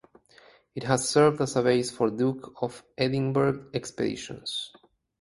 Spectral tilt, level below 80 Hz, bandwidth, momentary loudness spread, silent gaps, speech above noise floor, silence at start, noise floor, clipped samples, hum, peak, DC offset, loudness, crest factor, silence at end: -5 dB/octave; -62 dBFS; 11.5 kHz; 13 LU; none; 31 dB; 0.75 s; -57 dBFS; under 0.1%; none; -6 dBFS; under 0.1%; -27 LUFS; 22 dB; 0.5 s